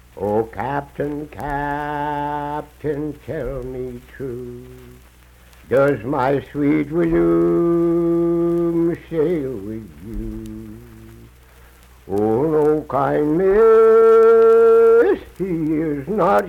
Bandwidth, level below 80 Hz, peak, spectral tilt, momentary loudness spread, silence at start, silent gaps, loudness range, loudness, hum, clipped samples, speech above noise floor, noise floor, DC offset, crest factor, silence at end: 13 kHz; -42 dBFS; -4 dBFS; -8.5 dB/octave; 19 LU; 0.15 s; none; 13 LU; -17 LUFS; 60 Hz at -60 dBFS; under 0.1%; 29 dB; -47 dBFS; under 0.1%; 14 dB; 0 s